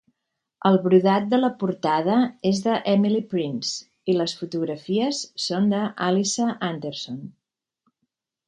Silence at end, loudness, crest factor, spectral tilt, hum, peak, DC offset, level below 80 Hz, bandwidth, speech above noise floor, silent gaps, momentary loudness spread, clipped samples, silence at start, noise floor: 1.15 s; -23 LUFS; 20 dB; -5.5 dB/octave; none; -4 dBFS; under 0.1%; -68 dBFS; 9.6 kHz; 59 dB; none; 10 LU; under 0.1%; 0.65 s; -81 dBFS